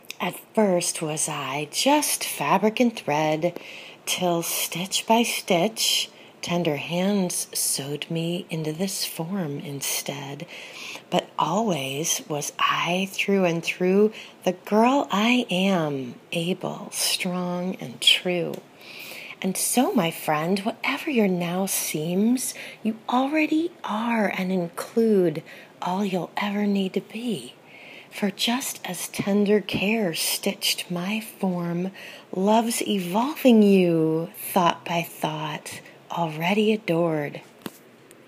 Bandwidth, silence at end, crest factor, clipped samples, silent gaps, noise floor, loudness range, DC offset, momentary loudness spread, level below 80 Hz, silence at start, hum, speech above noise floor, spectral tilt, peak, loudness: 15.5 kHz; 0.5 s; 20 dB; under 0.1%; none; -50 dBFS; 5 LU; under 0.1%; 12 LU; -72 dBFS; 0.1 s; none; 26 dB; -4 dB/octave; -4 dBFS; -24 LUFS